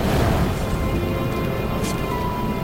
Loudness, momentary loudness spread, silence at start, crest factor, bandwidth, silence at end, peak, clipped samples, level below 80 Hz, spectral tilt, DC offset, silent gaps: -23 LUFS; 4 LU; 0 s; 14 dB; 16.5 kHz; 0 s; -8 dBFS; under 0.1%; -30 dBFS; -6.5 dB/octave; under 0.1%; none